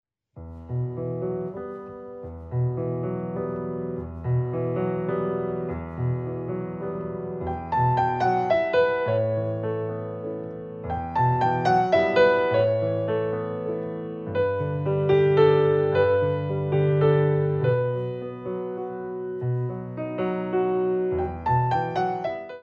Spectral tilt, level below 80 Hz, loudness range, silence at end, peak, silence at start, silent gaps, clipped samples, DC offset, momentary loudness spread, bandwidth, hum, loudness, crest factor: -9 dB/octave; -50 dBFS; 7 LU; 0 s; -6 dBFS; 0.35 s; none; under 0.1%; under 0.1%; 12 LU; 7 kHz; none; -25 LUFS; 18 dB